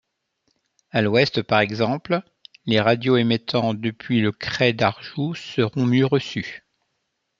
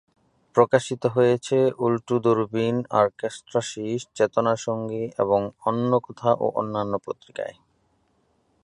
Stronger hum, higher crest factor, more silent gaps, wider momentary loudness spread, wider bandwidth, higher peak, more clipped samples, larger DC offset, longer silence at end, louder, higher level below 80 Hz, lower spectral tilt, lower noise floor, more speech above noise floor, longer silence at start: neither; about the same, 20 dB vs 22 dB; neither; about the same, 9 LU vs 9 LU; second, 7.6 kHz vs 10.5 kHz; about the same, -2 dBFS vs -2 dBFS; neither; neither; second, 0.8 s vs 1.1 s; first, -21 LUFS vs -24 LUFS; about the same, -60 dBFS vs -64 dBFS; about the same, -6.5 dB/octave vs -6 dB/octave; first, -75 dBFS vs -67 dBFS; first, 54 dB vs 44 dB; first, 0.95 s vs 0.55 s